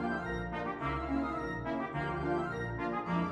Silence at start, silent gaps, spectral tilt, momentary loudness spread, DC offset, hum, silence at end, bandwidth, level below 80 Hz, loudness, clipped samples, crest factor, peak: 0 s; none; -8 dB/octave; 3 LU; under 0.1%; none; 0 s; 11 kHz; -50 dBFS; -36 LUFS; under 0.1%; 14 dB; -20 dBFS